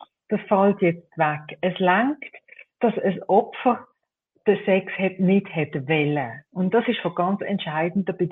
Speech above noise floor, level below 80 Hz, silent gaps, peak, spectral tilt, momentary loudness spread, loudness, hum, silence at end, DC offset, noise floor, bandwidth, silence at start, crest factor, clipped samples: 49 dB; -68 dBFS; none; -6 dBFS; -10 dB/octave; 8 LU; -23 LUFS; none; 0 s; under 0.1%; -71 dBFS; 4 kHz; 0.3 s; 18 dB; under 0.1%